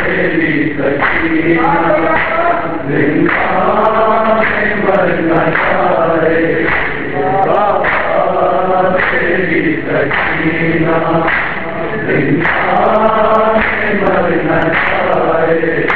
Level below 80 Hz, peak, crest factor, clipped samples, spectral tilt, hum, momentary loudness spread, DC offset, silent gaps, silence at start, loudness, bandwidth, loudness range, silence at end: -36 dBFS; 0 dBFS; 12 dB; under 0.1%; -9 dB/octave; none; 3 LU; 7%; none; 0 s; -12 LUFS; 5 kHz; 1 LU; 0 s